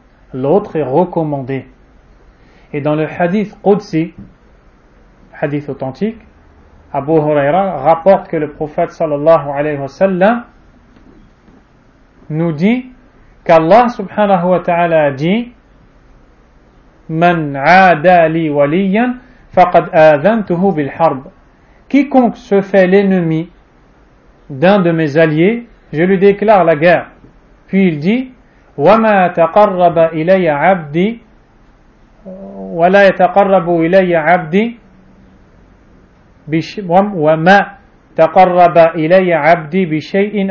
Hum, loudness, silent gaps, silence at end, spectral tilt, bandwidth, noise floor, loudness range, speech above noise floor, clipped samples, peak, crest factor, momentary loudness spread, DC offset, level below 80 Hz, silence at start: none; -12 LUFS; none; 0 s; -8 dB/octave; 7 kHz; -47 dBFS; 7 LU; 36 dB; 0.3%; 0 dBFS; 12 dB; 12 LU; under 0.1%; -46 dBFS; 0.35 s